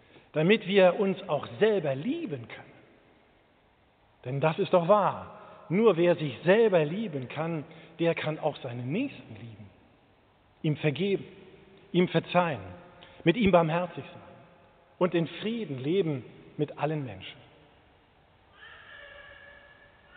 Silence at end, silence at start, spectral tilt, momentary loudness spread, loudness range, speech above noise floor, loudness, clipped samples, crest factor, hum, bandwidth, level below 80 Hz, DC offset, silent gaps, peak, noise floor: 0.7 s; 0.35 s; -5.5 dB/octave; 24 LU; 8 LU; 37 dB; -28 LUFS; under 0.1%; 22 dB; none; 4.6 kHz; -62 dBFS; under 0.1%; none; -8 dBFS; -64 dBFS